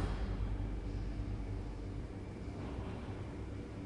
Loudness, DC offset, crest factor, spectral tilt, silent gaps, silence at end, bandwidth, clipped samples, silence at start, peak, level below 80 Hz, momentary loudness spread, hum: -43 LUFS; under 0.1%; 16 dB; -7.5 dB/octave; none; 0 s; 10.5 kHz; under 0.1%; 0 s; -24 dBFS; -44 dBFS; 5 LU; none